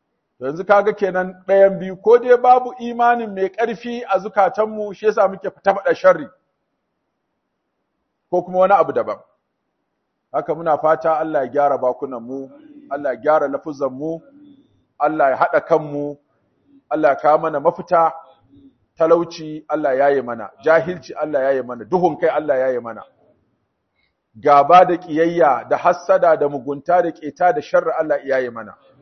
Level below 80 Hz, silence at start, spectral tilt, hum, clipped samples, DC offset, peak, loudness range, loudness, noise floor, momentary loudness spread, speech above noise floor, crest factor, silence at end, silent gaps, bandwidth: -66 dBFS; 0.4 s; -6.5 dB/octave; none; under 0.1%; under 0.1%; 0 dBFS; 6 LU; -17 LUFS; -73 dBFS; 13 LU; 56 dB; 18 dB; 0.3 s; none; 6.4 kHz